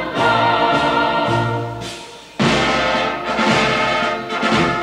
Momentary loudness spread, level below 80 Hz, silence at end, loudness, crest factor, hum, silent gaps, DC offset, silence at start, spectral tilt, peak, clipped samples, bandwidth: 11 LU; -42 dBFS; 0 s; -17 LUFS; 14 dB; none; none; under 0.1%; 0 s; -4.5 dB/octave; -2 dBFS; under 0.1%; 15 kHz